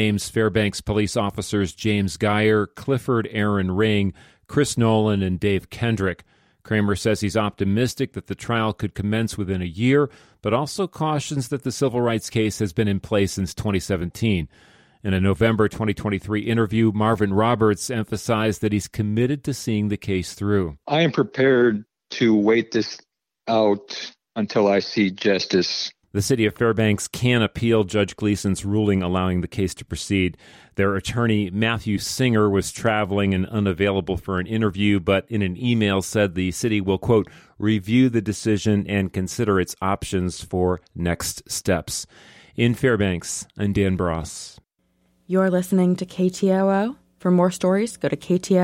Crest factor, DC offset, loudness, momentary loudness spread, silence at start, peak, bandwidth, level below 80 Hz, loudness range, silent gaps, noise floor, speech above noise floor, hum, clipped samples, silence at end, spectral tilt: 14 dB; under 0.1%; -22 LUFS; 7 LU; 0 s; -6 dBFS; 16.5 kHz; -46 dBFS; 3 LU; none; -66 dBFS; 45 dB; none; under 0.1%; 0 s; -5.5 dB/octave